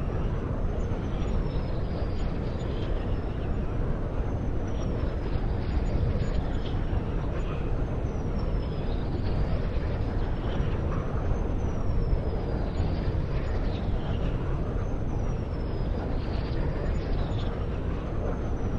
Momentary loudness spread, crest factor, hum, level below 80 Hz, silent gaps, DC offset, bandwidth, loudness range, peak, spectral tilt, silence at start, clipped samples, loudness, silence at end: 2 LU; 14 dB; none; -30 dBFS; none; under 0.1%; 7.2 kHz; 1 LU; -14 dBFS; -8.5 dB/octave; 0 s; under 0.1%; -31 LUFS; 0 s